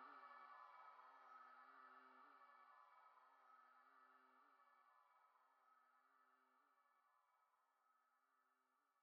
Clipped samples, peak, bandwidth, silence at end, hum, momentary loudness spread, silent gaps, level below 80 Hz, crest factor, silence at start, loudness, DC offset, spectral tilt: under 0.1%; -52 dBFS; 5 kHz; 0 s; none; 6 LU; none; under -90 dBFS; 18 dB; 0 s; -66 LUFS; under 0.1%; 1.5 dB/octave